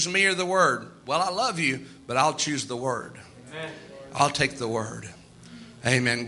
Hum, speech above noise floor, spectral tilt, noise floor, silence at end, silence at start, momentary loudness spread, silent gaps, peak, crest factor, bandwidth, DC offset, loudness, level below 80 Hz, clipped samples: none; 21 dB; -3.5 dB/octave; -46 dBFS; 0 s; 0 s; 20 LU; none; -6 dBFS; 22 dB; 12 kHz; under 0.1%; -25 LUFS; -62 dBFS; under 0.1%